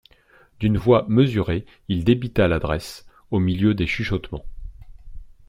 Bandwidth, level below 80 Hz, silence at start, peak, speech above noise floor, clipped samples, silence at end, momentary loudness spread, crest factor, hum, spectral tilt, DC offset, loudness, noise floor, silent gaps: 15.5 kHz; -38 dBFS; 0.6 s; -4 dBFS; 35 dB; under 0.1%; 0.15 s; 11 LU; 18 dB; none; -7.5 dB/octave; under 0.1%; -21 LUFS; -55 dBFS; none